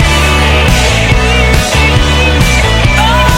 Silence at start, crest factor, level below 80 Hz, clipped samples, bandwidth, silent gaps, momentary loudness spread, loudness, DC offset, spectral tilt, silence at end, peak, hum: 0 s; 8 dB; -12 dBFS; 0.5%; 16.5 kHz; none; 1 LU; -8 LUFS; under 0.1%; -4 dB/octave; 0 s; 0 dBFS; none